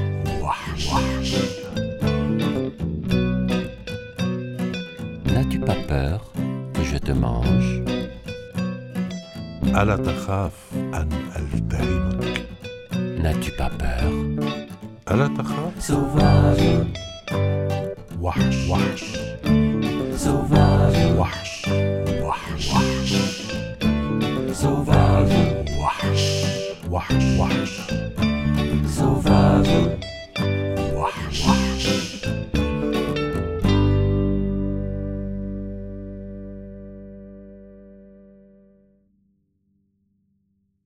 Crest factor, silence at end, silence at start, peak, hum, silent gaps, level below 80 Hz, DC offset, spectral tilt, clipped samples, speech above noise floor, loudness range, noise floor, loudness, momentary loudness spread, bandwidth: 20 dB; 2.8 s; 0 s; -2 dBFS; 50 Hz at -45 dBFS; none; -32 dBFS; under 0.1%; -6.5 dB/octave; under 0.1%; 48 dB; 5 LU; -68 dBFS; -22 LUFS; 13 LU; 15 kHz